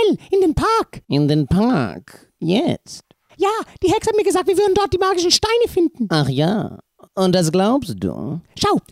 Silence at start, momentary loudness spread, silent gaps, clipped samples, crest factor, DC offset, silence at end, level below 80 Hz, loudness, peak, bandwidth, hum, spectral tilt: 0 s; 11 LU; none; under 0.1%; 18 dB; under 0.1%; 0.1 s; -42 dBFS; -18 LUFS; 0 dBFS; 15.5 kHz; none; -5 dB/octave